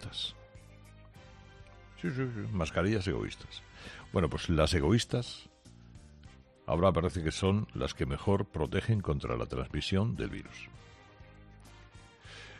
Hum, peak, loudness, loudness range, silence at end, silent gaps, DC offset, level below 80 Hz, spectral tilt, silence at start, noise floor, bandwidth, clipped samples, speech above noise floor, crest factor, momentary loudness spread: none; -14 dBFS; -32 LUFS; 5 LU; 0 s; none; under 0.1%; -48 dBFS; -6 dB/octave; 0 s; -56 dBFS; 11.5 kHz; under 0.1%; 24 dB; 20 dB; 20 LU